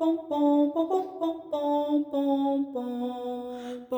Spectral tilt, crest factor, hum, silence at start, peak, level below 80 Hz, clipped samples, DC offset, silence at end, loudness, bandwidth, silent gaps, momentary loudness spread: -6 dB/octave; 14 dB; none; 0 s; -12 dBFS; -72 dBFS; under 0.1%; under 0.1%; 0 s; -28 LUFS; over 20 kHz; none; 11 LU